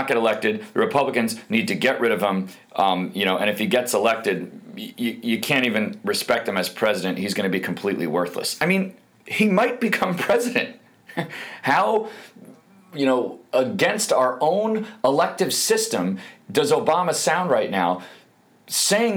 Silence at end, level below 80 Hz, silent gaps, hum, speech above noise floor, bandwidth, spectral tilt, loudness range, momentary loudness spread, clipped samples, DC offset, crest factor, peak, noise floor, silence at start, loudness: 0 s; -70 dBFS; none; none; 33 dB; over 20 kHz; -3.5 dB/octave; 2 LU; 9 LU; under 0.1%; under 0.1%; 18 dB; -6 dBFS; -55 dBFS; 0 s; -22 LUFS